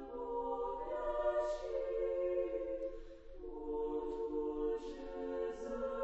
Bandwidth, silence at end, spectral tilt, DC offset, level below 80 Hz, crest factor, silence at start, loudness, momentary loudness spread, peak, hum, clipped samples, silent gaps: 8 kHz; 0 s; -5 dB/octave; under 0.1%; -54 dBFS; 14 dB; 0 s; -40 LUFS; 10 LU; -26 dBFS; none; under 0.1%; none